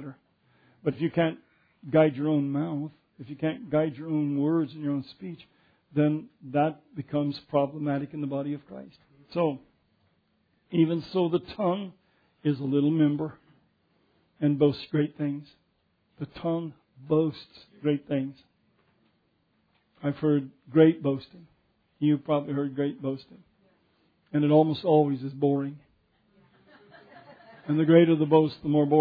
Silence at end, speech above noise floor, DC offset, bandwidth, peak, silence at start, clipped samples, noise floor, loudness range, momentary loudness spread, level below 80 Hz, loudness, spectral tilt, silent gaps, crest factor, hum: 0 s; 45 dB; under 0.1%; 5 kHz; -6 dBFS; 0 s; under 0.1%; -71 dBFS; 5 LU; 16 LU; -68 dBFS; -27 LUFS; -10.5 dB/octave; none; 20 dB; none